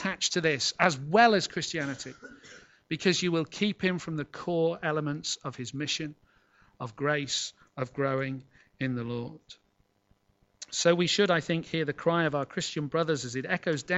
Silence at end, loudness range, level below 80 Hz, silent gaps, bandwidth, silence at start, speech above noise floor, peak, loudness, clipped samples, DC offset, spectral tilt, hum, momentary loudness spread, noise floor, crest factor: 0 s; 6 LU; -66 dBFS; none; 8.2 kHz; 0 s; 42 dB; -6 dBFS; -29 LUFS; under 0.1%; under 0.1%; -4 dB/octave; none; 13 LU; -71 dBFS; 24 dB